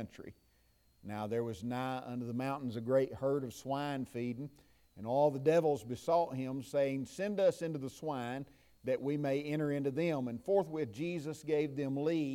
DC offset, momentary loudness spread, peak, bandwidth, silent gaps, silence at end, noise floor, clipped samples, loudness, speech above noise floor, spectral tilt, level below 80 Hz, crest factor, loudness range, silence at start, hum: under 0.1%; 11 LU; -18 dBFS; 16.5 kHz; none; 0 s; -70 dBFS; under 0.1%; -36 LUFS; 35 dB; -7 dB/octave; -70 dBFS; 18 dB; 4 LU; 0 s; none